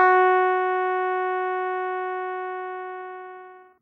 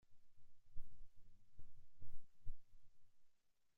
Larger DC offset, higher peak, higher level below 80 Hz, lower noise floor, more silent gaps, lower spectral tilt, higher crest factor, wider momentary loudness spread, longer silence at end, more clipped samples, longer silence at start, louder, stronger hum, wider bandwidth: neither; first, -6 dBFS vs -30 dBFS; second, -84 dBFS vs -58 dBFS; second, -44 dBFS vs -72 dBFS; neither; second, -4.5 dB/octave vs -6.5 dB/octave; about the same, 18 dB vs 14 dB; first, 18 LU vs 5 LU; second, 0.2 s vs 0.45 s; neither; about the same, 0 s vs 0.1 s; first, -24 LUFS vs -66 LUFS; neither; first, 4.3 kHz vs 0.6 kHz